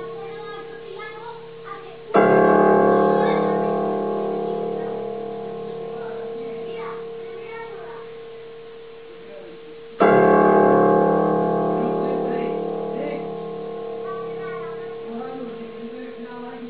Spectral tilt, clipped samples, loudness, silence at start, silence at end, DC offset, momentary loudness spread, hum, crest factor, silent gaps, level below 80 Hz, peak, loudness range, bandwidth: -11.5 dB/octave; under 0.1%; -21 LUFS; 0 s; 0 s; 0.4%; 22 LU; none; 20 dB; none; -66 dBFS; -2 dBFS; 15 LU; 4.7 kHz